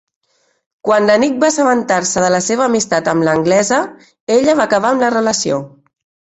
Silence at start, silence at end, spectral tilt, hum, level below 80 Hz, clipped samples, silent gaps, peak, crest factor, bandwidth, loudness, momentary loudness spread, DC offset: 0.85 s; 0.6 s; -4 dB/octave; none; -54 dBFS; under 0.1%; 4.20-4.27 s; -2 dBFS; 14 dB; 8.2 kHz; -14 LUFS; 5 LU; under 0.1%